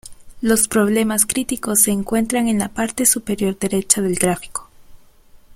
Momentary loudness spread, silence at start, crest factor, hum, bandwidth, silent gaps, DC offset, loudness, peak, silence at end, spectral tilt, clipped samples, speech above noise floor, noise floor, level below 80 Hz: 7 LU; 0.05 s; 20 dB; none; 16.5 kHz; none; under 0.1%; -17 LUFS; 0 dBFS; 0 s; -3.5 dB/octave; under 0.1%; 28 dB; -46 dBFS; -46 dBFS